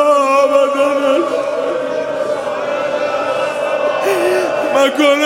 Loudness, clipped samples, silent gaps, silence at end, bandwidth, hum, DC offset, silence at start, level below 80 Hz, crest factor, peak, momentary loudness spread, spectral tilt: -15 LUFS; under 0.1%; none; 0 s; 16.5 kHz; none; under 0.1%; 0 s; -62 dBFS; 14 dB; 0 dBFS; 7 LU; -3.5 dB/octave